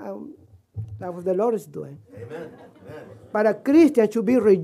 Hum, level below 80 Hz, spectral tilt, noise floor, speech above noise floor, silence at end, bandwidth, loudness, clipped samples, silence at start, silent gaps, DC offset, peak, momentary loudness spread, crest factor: none; -62 dBFS; -7.5 dB/octave; -47 dBFS; 26 dB; 0 s; 14 kHz; -20 LUFS; under 0.1%; 0 s; none; under 0.1%; -6 dBFS; 25 LU; 16 dB